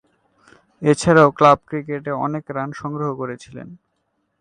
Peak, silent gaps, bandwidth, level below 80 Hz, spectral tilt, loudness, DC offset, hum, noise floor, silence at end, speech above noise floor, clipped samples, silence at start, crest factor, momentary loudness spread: 0 dBFS; none; 11 kHz; -52 dBFS; -6 dB/octave; -18 LUFS; under 0.1%; none; -71 dBFS; 0.65 s; 52 dB; under 0.1%; 0.8 s; 20 dB; 17 LU